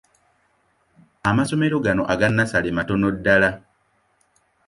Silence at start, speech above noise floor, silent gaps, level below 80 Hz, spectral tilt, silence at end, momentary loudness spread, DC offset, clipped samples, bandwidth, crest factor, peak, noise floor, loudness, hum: 1.25 s; 45 dB; none; -48 dBFS; -6.5 dB/octave; 1.1 s; 5 LU; under 0.1%; under 0.1%; 11.5 kHz; 20 dB; -2 dBFS; -65 dBFS; -20 LUFS; none